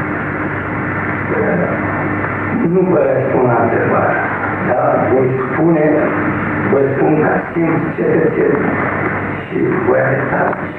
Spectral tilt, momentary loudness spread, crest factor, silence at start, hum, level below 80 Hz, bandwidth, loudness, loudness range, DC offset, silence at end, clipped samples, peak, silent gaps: -10.5 dB/octave; 5 LU; 14 dB; 0 s; none; -42 dBFS; 4.2 kHz; -15 LUFS; 1 LU; under 0.1%; 0 s; under 0.1%; -2 dBFS; none